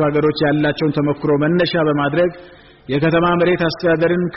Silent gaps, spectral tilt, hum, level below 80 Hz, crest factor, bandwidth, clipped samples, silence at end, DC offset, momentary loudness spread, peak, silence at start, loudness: none; -5 dB/octave; none; -46 dBFS; 10 dB; 6 kHz; under 0.1%; 0 s; under 0.1%; 4 LU; -6 dBFS; 0 s; -17 LUFS